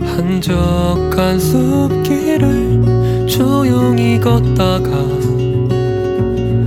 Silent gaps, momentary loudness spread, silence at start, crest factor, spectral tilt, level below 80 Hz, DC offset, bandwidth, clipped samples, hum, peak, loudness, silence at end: none; 4 LU; 0 s; 12 dB; -7 dB/octave; -26 dBFS; under 0.1%; 16.5 kHz; under 0.1%; none; 0 dBFS; -14 LUFS; 0 s